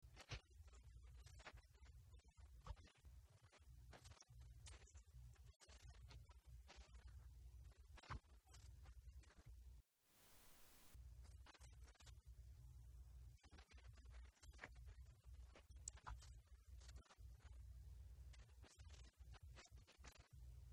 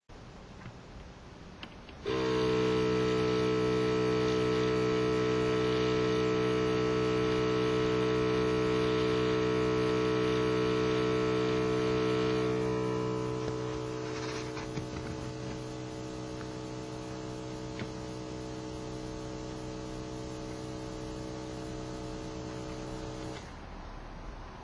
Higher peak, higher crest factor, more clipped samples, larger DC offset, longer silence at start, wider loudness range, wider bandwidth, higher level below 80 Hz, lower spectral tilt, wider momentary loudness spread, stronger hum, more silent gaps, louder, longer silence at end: second, -34 dBFS vs -18 dBFS; first, 30 dB vs 14 dB; neither; neither; about the same, 0 s vs 0.1 s; second, 4 LU vs 11 LU; first, 19 kHz vs 10.5 kHz; second, -64 dBFS vs -50 dBFS; second, -3.5 dB/octave vs -6 dB/octave; second, 9 LU vs 17 LU; neither; first, 5.56-5.60 s vs none; second, -65 LUFS vs -32 LUFS; about the same, 0 s vs 0 s